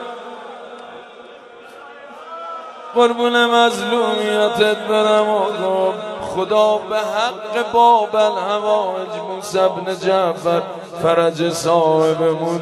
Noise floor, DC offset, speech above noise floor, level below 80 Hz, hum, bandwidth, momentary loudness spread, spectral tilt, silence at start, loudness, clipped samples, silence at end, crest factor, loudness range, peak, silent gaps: -39 dBFS; under 0.1%; 23 dB; -62 dBFS; none; 13 kHz; 19 LU; -4.5 dB/octave; 0 s; -17 LUFS; under 0.1%; 0 s; 16 dB; 3 LU; 0 dBFS; none